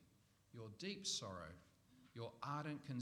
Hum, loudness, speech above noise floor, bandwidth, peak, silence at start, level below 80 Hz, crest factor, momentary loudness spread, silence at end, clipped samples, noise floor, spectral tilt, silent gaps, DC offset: none; -48 LUFS; 26 dB; 19 kHz; -32 dBFS; 0 s; -78 dBFS; 20 dB; 17 LU; 0 s; under 0.1%; -74 dBFS; -3.5 dB/octave; none; under 0.1%